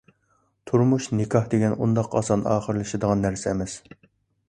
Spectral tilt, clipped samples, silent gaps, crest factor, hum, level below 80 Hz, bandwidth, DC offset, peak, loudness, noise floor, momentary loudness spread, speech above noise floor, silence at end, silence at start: -7 dB/octave; under 0.1%; none; 18 dB; none; -50 dBFS; 10.5 kHz; under 0.1%; -6 dBFS; -24 LUFS; -67 dBFS; 6 LU; 45 dB; 0.7 s; 0.65 s